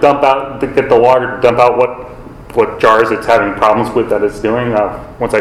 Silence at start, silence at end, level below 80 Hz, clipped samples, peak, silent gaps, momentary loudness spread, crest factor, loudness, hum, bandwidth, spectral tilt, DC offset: 0 s; 0 s; -38 dBFS; 0.5%; 0 dBFS; none; 7 LU; 12 dB; -12 LUFS; none; 13.5 kHz; -6 dB/octave; under 0.1%